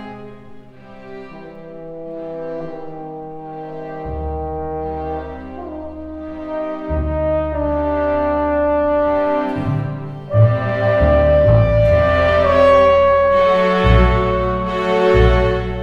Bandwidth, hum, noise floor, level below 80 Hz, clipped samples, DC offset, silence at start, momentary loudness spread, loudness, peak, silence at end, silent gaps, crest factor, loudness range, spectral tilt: 7.4 kHz; none; -38 dBFS; -26 dBFS; under 0.1%; under 0.1%; 0 s; 18 LU; -16 LUFS; 0 dBFS; 0 s; none; 16 dB; 16 LU; -8.5 dB/octave